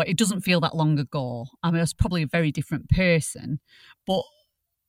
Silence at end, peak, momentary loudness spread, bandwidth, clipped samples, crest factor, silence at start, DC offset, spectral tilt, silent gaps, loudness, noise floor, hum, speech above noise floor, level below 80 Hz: 0.65 s; -6 dBFS; 12 LU; 16 kHz; under 0.1%; 18 dB; 0 s; under 0.1%; -5.5 dB/octave; none; -25 LUFS; -71 dBFS; none; 47 dB; -40 dBFS